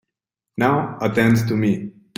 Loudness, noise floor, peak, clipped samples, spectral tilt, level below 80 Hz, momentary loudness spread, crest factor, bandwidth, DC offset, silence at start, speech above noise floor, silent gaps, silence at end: -19 LUFS; -84 dBFS; -2 dBFS; under 0.1%; -7 dB/octave; -52 dBFS; 7 LU; 18 dB; 16 kHz; under 0.1%; 0.55 s; 66 dB; none; 0.3 s